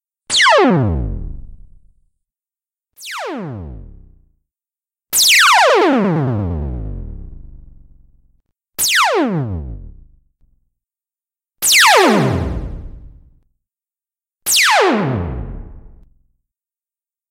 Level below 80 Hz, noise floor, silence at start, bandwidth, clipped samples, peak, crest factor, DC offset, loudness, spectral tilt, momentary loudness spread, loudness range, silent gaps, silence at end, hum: -34 dBFS; under -90 dBFS; 0.3 s; 16 kHz; under 0.1%; 0 dBFS; 18 dB; under 0.1%; -13 LUFS; -3 dB/octave; 23 LU; 11 LU; none; 1.45 s; none